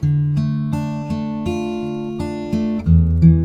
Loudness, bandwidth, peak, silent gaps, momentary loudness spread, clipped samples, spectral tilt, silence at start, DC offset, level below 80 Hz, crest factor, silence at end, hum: -19 LUFS; 7.2 kHz; 0 dBFS; none; 11 LU; under 0.1%; -9 dB/octave; 0 s; 0.2%; -28 dBFS; 16 dB; 0 s; none